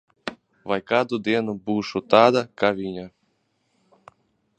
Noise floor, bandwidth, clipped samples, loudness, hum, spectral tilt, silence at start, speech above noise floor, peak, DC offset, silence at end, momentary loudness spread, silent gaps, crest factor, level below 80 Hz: -70 dBFS; 9 kHz; under 0.1%; -22 LUFS; none; -6 dB/octave; 0.25 s; 48 dB; 0 dBFS; under 0.1%; 1.5 s; 19 LU; none; 24 dB; -62 dBFS